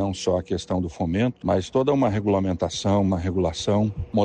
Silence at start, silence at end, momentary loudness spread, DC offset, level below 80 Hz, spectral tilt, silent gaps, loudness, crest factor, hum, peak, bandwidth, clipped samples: 0 s; 0 s; 4 LU; under 0.1%; -44 dBFS; -6.5 dB/octave; none; -23 LUFS; 14 dB; none; -10 dBFS; 9.6 kHz; under 0.1%